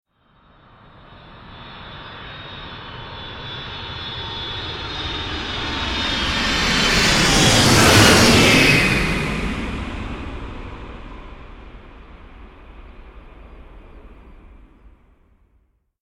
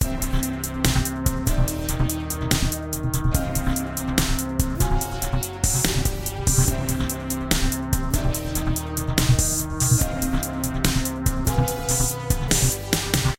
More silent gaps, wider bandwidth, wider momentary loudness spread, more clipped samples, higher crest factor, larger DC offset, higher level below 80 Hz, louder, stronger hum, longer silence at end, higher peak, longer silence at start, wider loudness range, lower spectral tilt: neither; about the same, 16.5 kHz vs 17 kHz; first, 25 LU vs 6 LU; neither; about the same, 20 dB vs 22 dB; neither; second, -34 dBFS vs -28 dBFS; first, -16 LUFS vs -23 LUFS; neither; first, 1.5 s vs 0.05 s; about the same, 0 dBFS vs 0 dBFS; first, 1.15 s vs 0 s; first, 22 LU vs 2 LU; about the same, -3.5 dB/octave vs -4 dB/octave